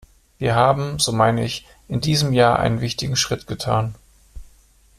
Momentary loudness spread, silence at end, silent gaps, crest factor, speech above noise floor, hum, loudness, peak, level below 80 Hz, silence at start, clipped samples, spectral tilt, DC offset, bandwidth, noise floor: 10 LU; 0.55 s; none; 18 dB; 34 dB; none; -20 LUFS; -2 dBFS; -44 dBFS; 0.4 s; under 0.1%; -4.5 dB/octave; under 0.1%; 14.5 kHz; -53 dBFS